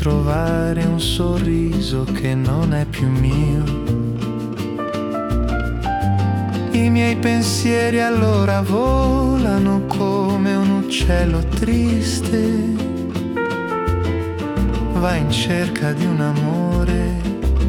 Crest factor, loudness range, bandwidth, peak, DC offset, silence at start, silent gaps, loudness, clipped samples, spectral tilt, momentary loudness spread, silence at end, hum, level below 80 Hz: 14 dB; 4 LU; 18 kHz; -4 dBFS; under 0.1%; 0 s; none; -19 LUFS; under 0.1%; -6.5 dB/octave; 5 LU; 0 s; none; -26 dBFS